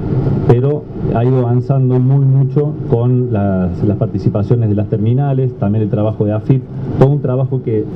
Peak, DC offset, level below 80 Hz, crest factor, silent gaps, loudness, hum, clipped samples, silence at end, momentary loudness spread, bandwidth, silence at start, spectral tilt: 0 dBFS; under 0.1%; -36 dBFS; 12 dB; none; -14 LUFS; none; under 0.1%; 0 s; 4 LU; 3.7 kHz; 0 s; -11.5 dB/octave